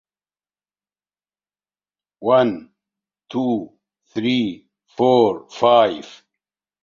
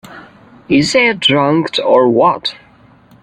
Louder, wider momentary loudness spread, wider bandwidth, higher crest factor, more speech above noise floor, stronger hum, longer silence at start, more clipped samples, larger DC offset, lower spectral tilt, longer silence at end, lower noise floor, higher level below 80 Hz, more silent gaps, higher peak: second, -19 LUFS vs -12 LUFS; first, 18 LU vs 5 LU; second, 7.2 kHz vs 10.5 kHz; first, 20 dB vs 14 dB; first, over 72 dB vs 33 dB; first, 50 Hz at -60 dBFS vs none; first, 2.2 s vs 0.1 s; neither; neither; first, -6.5 dB/octave vs -4.5 dB/octave; about the same, 0.7 s vs 0.7 s; first, under -90 dBFS vs -45 dBFS; second, -64 dBFS vs -52 dBFS; neither; about the same, -2 dBFS vs 0 dBFS